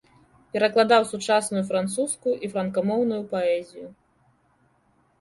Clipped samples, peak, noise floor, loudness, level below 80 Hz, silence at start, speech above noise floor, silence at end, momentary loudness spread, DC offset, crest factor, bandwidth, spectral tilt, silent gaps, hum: under 0.1%; -6 dBFS; -64 dBFS; -24 LUFS; -66 dBFS; 0.55 s; 41 dB; 1.3 s; 11 LU; under 0.1%; 20 dB; 11.5 kHz; -4 dB/octave; none; none